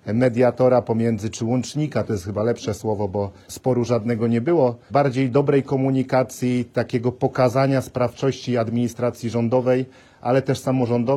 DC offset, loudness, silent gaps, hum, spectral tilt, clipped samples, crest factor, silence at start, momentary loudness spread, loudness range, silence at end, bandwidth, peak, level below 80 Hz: under 0.1%; -21 LUFS; none; none; -7 dB/octave; under 0.1%; 14 dB; 0.05 s; 7 LU; 3 LU; 0 s; 13.5 kHz; -6 dBFS; -56 dBFS